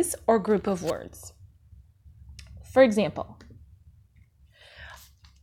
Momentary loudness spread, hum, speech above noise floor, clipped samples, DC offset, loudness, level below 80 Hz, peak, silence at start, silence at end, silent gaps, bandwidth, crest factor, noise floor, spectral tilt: 26 LU; none; 33 dB; under 0.1%; under 0.1%; -25 LUFS; -54 dBFS; -6 dBFS; 0 s; 0.45 s; none; 16.5 kHz; 22 dB; -58 dBFS; -5 dB/octave